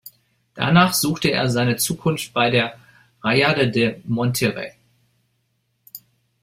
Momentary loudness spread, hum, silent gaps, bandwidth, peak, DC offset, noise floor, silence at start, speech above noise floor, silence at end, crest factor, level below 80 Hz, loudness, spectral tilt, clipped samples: 18 LU; none; none; 16.5 kHz; -2 dBFS; under 0.1%; -69 dBFS; 0.05 s; 50 dB; 0.45 s; 20 dB; -56 dBFS; -19 LUFS; -4.5 dB/octave; under 0.1%